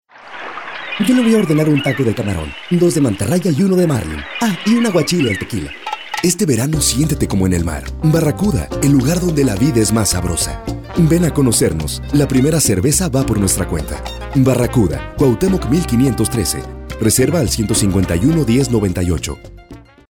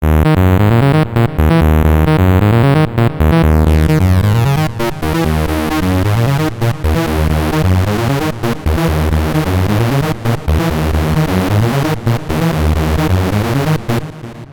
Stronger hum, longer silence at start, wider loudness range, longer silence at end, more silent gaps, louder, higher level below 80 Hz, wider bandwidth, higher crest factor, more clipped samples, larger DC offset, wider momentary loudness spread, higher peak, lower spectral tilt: neither; first, 0.2 s vs 0 s; about the same, 2 LU vs 4 LU; first, 0.3 s vs 0 s; neither; about the same, -15 LUFS vs -13 LUFS; second, -30 dBFS vs -20 dBFS; about the same, 18.5 kHz vs 19 kHz; about the same, 12 dB vs 10 dB; neither; neither; first, 10 LU vs 6 LU; about the same, -4 dBFS vs -2 dBFS; second, -5 dB/octave vs -7 dB/octave